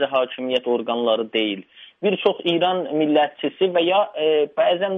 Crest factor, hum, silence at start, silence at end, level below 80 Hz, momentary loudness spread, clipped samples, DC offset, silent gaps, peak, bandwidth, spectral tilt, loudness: 16 dB; none; 0 s; 0 s; -72 dBFS; 5 LU; under 0.1%; under 0.1%; none; -4 dBFS; 5.8 kHz; -7 dB/octave; -21 LUFS